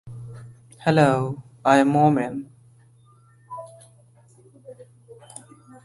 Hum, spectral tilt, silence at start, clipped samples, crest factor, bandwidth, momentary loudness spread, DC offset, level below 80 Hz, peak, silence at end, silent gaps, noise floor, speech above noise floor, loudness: none; -7 dB/octave; 0.05 s; under 0.1%; 22 dB; 11.5 kHz; 25 LU; under 0.1%; -62 dBFS; -2 dBFS; 0.7 s; none; -54 dBFS; 36 dB; -20 LUFS